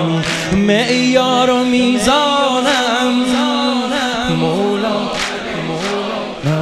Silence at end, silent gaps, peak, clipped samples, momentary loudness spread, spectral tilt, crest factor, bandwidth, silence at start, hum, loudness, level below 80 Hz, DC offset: 0 s; none; 0 dBFS; under 0.1%; 7 LU; -4.5 dB/octave; 14 dB; 13.5 kHz; 0 s; none; -15 LUFS; -42 dBFS; under 0.1%